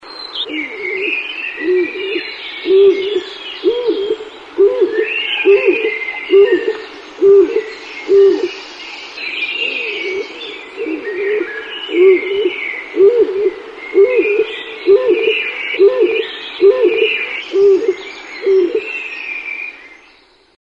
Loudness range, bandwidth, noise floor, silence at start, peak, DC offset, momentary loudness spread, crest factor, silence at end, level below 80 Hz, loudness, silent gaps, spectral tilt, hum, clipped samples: 4 LU; 7.2 kHz; -48 dBFS; 0.05 s; 0 dBFS; under 0.1%; 14 LU; 14 dB; 0.7 s; -58 dBFS; -14 LUFS; none; -4 dB/octave; none; under 0.1%